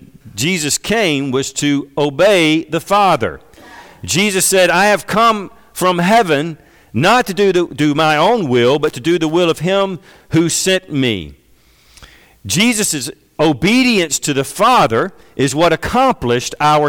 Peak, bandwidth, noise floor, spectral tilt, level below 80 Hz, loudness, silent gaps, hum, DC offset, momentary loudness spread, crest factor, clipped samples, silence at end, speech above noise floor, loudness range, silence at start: -4 dBFS; 19 kHz; -50 dBFS; -4 dB/octave; -44 dBFS; -14 LUFS; none; none; under 0.1%; 8 LU; 10 dB; under 0.1%; 0 s; 36 dB; 4 LU; 0.25 s